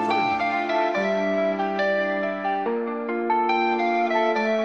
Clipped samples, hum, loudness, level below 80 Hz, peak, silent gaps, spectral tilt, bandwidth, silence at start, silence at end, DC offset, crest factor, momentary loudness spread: under 0.1%; none; -23 LUFS; -70 dBFS; -8 dBFS; none; -6 dB/octave; 8 kHz; 0 s; 0 s; 0.1%; 14 dB; 4 LU